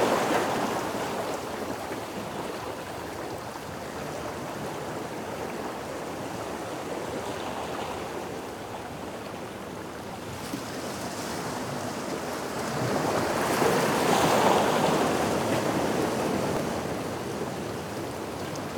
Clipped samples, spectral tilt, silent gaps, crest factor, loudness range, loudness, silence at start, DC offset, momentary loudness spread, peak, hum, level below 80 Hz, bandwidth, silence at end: under 0.1%; -4.5 dB/octave; none; 20 dB; 11 LU; -30 LUFS; 0 s; under 0.1%; 13 LU; -8 dBFS; none; -56 dBFS; 19.5 kHz; 0 s